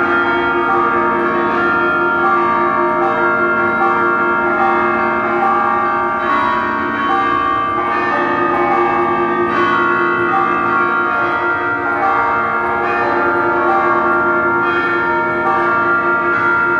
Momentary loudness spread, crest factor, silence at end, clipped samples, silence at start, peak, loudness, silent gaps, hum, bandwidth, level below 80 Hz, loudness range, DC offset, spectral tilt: 2 LU; 12 dB; 0 s; under 0.1%; 0 s; -2 dBFS; -14 LUFS; none; none; 7 kHz; -48 dBFS; 1 LU; under 0.1%; -6.5 dB/octave